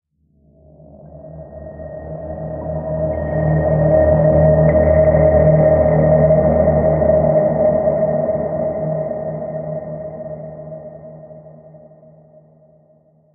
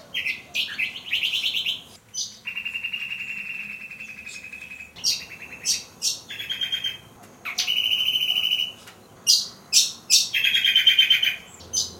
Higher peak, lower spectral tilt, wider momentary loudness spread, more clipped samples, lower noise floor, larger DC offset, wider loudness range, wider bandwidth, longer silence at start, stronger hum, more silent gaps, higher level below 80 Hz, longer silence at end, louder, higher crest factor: about the same, -2 dBFS vs -2 dBFS; first, -12 dB/octave vs 2.5 dB/octave; first, 21 LU vs 18 LU; neither; first, -56 dBFS vs -47 dBFS; neither; first, 17 LU vs 11 LU; second, 2.5 kHz vs 16.5 kHz; first, 1.05 s vs 0 s; neither; neither; first, -30 dBFS vs -66 dBFS; first, 1.6 s vs 0 s; first, -15 LUFS vs -22 LUFS; second, 14 dB vs 24 dB